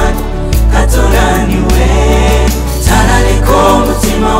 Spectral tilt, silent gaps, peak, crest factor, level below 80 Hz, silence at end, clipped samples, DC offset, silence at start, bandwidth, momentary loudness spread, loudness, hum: -5 dB/octave; none; 0 dBFS; 8 dB; -10 dBFS; 0 s; under 0.1%; under 0.1%; 0 s; 16.5 kHz; 5 LU; -10 LUFS; none